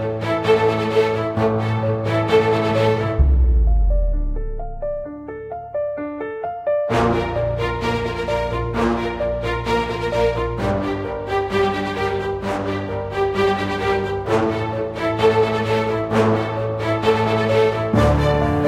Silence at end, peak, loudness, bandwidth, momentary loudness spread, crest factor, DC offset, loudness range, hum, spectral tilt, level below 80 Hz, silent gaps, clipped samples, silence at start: 0 s; -4 dBFS; -20 LUFS; 13 kHz; 9 LU; 16 dB; under 0.1%; 5 LU; none; -7 dB/octave; -26 dBFS; none; under 0.1%; 0 s